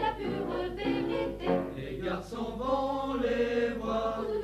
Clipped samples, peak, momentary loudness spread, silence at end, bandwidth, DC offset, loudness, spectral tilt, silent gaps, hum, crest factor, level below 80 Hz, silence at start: under 0.1%; -14 dBFS; 6 LU; 0 s; 14 kHz; under 0.1%; -32 LUFS; -6.5 dB/octave; none; 50 Hz at -55 dBFS; 16 dB; -48 dBFS; 0 s